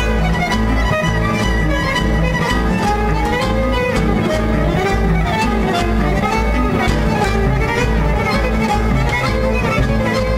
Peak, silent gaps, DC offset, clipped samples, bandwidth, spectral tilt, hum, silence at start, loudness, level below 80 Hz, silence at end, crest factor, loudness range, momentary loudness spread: -2 dBFS; none; under 0.1%; under 0.1%; 15 kHz; -6 dB/octave; none; 0 s; -16 LUFS; -20 dBFS; 0 s; 14 dB; 0 LU; 1 LU